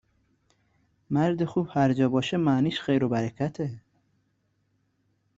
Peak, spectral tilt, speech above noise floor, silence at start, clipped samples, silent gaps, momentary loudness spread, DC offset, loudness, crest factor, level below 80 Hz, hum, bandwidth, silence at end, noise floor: -10 dBFS; -7.5 dB/octave; 47 dB; 1.1 s; under 0.1%; none; 7 LU; under 0.1%; -26 LUFS; 18 dB; -62 dBFS; none; 7.8 kHz; 1.6 s; -72 dBFS